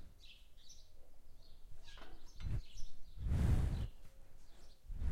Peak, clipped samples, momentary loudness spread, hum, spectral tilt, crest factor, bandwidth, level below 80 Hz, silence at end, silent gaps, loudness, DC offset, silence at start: -24 dBFS; under 0.1%; 28 LU; none; -7 dB/octave; 18 dB; 12.5 kHz; -44 dBFS; 0 s; none; -41 LUFS; under 0.1%; 0 s